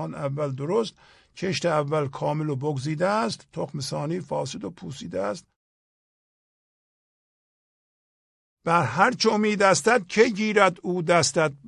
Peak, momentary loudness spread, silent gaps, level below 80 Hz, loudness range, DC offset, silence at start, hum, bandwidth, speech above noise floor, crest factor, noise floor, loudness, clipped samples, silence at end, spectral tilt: -4 dBFS; 13 LU; 5.56-8.57 s; -62 dBFS; 16 LU; under 0.1%; 0 s; none; 12 kHz; over 66 dB; 22 dB; under -90 dBFS; -24 LUFS; under 0.1%; 0 s; -4.5 dB/octave